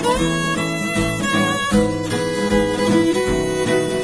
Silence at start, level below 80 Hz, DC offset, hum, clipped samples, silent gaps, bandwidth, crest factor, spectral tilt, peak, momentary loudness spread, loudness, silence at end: 0 s; -36 dBFS; 0.3%; none; under 0.1%; none; 11 kHz; 14 dB; -4.5 dB/octave; -4 dBFS; 4 LU; -18 LUFS; 0 s